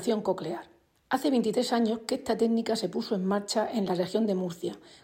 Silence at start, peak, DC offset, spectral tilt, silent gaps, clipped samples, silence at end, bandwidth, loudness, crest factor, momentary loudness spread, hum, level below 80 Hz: 0 s; -12 dBFS; under 0.1%; -5.5 dB/octave; none; under 0.1%; 0.05 s; 16 kHz; -29 LUFS; 18 dB; 8 LU; none; -68 dBFS